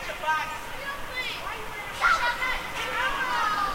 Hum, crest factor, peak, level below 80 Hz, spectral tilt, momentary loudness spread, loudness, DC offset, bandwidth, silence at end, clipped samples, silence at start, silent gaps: none; 18 dB; -10 dBFS; -44 dBFS; -2 dB/octave; 11 LU; -27 LUFS; under 0.1%; 16 kHz; 0 s; under 0.1%; 0 s; none